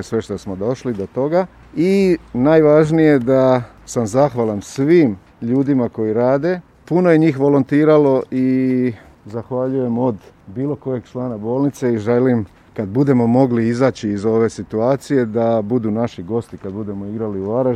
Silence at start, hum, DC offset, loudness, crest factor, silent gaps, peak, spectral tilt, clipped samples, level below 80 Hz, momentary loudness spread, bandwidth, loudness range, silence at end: 0 s; none; under 0.1%; -17 LUFS; 16 dB; none; 0 dBFS; -8 dB/octave; under 0.1%; -50 dBFS; 12 LU; 12.5 kHz; 5 LU; 0 s